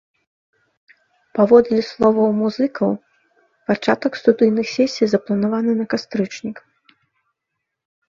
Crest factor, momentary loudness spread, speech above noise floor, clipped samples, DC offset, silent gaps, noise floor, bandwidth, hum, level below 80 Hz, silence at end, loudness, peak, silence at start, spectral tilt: 20 dB; 14 LU; 62 dB; under 0.1%; under 0.1%; none; -79 dBFS; 7.4 kHz; none; -60 dBFS; 1.5 s; -18 LUFS; 0 dBFS; 1.35 s; -6.5 dB/octave